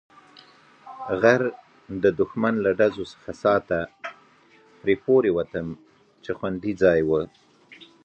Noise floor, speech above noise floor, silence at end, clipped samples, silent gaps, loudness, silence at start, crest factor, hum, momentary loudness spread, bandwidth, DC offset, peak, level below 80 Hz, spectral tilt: -56 dBFS; 33 dB; 0.2 s; under 0.1%; none; -23 LUFS; 0.85 s; 22 dB; none; 17 LU; 8 kHz; under 0.1%; -4 dBFS; -54 dBFS; -7 dB/octave